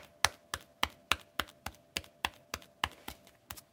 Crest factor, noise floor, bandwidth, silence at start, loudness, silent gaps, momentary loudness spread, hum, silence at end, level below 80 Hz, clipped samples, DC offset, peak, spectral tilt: 38 dB; -52 dBFS; 18 kHz; 0 s; -37 LUFS; none; 16 LU; none; 0.1 s; -58 dBFS; under 0.1%; under 0.1%; -2 dBFS; -1 dB/octave